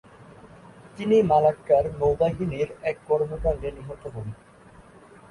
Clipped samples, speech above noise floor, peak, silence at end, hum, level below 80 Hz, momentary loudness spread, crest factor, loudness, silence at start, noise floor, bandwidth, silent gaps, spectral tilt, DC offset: under 0.1%; 27 dB; -8 dBFS; 0.5 s; none; -44 dBFS; 17 LU; 18 dB; -24 LUFS; 0.2 s; -50 dBFS; 11 kHz; none; -8 dB/octave; under 0.1%